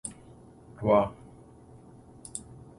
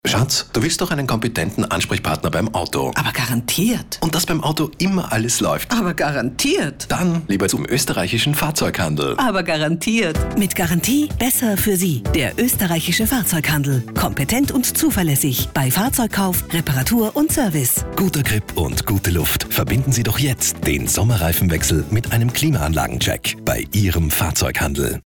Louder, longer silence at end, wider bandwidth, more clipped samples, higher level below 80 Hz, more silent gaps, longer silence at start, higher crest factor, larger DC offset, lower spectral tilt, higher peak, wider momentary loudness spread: second, -29 LUFS vs -18 LUFS; first, 0.4 s vs 0.05 s; second, 11.5 kHz vs over 20 kHz; neither; second, -56 dBFS vs -34 dBFS; neither; about the same, 0.05 s vs 0.05 s; first, 24 dB vs 12 dB; second, under 0.1% vs 0.2%; first, -6 dB/octave vs -4 dB/octave; about the same, -10 dBFS vs -8 dBFS; first, 27 LU vs 4 LU